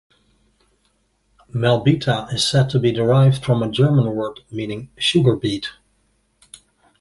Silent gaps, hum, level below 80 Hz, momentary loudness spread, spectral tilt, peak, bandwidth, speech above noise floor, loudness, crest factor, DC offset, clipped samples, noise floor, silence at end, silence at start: none; none; -50 dBFS; 12 LU; -6 dB/octave; -2 dBFS; 11.5 kHz; 47 dB; -18 LUFS; 18 dB; under 0.1%; under 0.1%; -65 dBFS; 1.3 s; 1.55 s